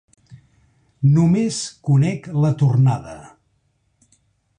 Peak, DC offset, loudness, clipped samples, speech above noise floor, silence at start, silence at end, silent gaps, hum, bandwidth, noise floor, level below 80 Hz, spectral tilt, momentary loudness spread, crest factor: -6 dBFS; under 0.1%; -18 LUFS; under 0.1%; 49 dB; 0.3 s; 1.3 s; none; none; 10 kHz; -66 dBFS; -52 dBFS; -7 dB/octave; 11 LU; 14 dB